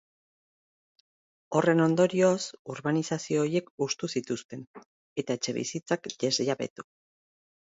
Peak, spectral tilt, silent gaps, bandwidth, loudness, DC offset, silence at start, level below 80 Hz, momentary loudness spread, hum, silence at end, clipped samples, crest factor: -10 dBFS; -5 dB/octave; 2.59-2.65 s, 3.70-3.78 s, 4.45-4.49 s, 4.67-4.74 s, 4.86-5.16 s, 6.70-6.76 s; 8 kHz; -28 LUFS; under 0.1%; 1.5 s; -74 dBFS; 13 LU; none; 0.9 s; under 0.1%; 20 dB